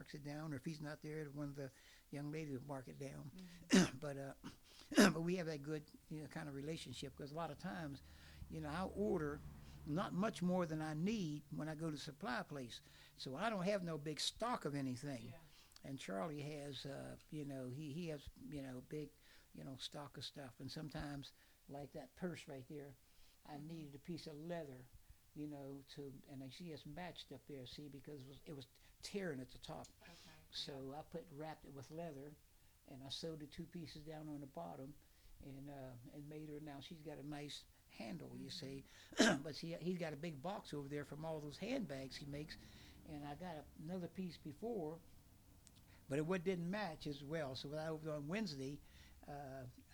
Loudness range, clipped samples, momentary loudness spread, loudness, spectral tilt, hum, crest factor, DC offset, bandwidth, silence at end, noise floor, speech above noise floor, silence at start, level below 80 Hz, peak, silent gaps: 12 LU; under 0.1%; 15 LU; -46 LUFS; -5 dB/octave; none; 30 dB; under 0.1%; over 20 kHz; 0 s; -66 dBFS; 20 dB; 0 s; -68 dBFS; -18 dBFS; none